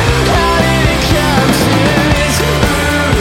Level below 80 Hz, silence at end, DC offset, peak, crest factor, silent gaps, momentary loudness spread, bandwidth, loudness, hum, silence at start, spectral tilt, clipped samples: -20 dBFS; 0 s; under 0.1%; 0 dBFS; 10 dB; none; 1 LU; 17 kHz; -11 LUFS; none; 0 s; -4.5 dB/octave; under 0.1%